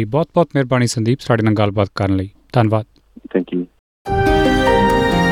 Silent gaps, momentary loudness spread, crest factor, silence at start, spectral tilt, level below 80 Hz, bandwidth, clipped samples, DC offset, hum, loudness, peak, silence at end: 3.79-4.05 s; 9 LU; 14 dB; 0 s; -6.5 dB/octave; -32 dBFS; 16.5 kHz; under 0.1%; under 0.1%; none; -17 LUFS; -2 dBFS; 0 s